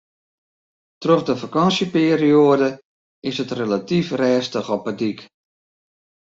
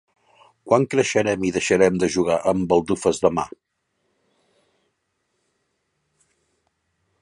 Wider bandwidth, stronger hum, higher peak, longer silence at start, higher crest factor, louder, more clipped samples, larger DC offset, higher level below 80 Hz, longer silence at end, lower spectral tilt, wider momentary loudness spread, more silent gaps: second, 7.8 kHz vs 11.5 kHz; neither; about the same, -2 dBFS vs -4 dBFS; first, 1 s vs 0.65 s; about the same, 18 dB vs 20 dB; about the same, -19 LUFS vs -20 LUFS; neither; neither; second, -62 dBFS vs -54 dBFS; second, 1.05 s vs 3.75 s; about the same, -6 dB/octave vs -5 dB/octave; first, 12 LU vs 4 LU; first, 2.85-3.22 s vs none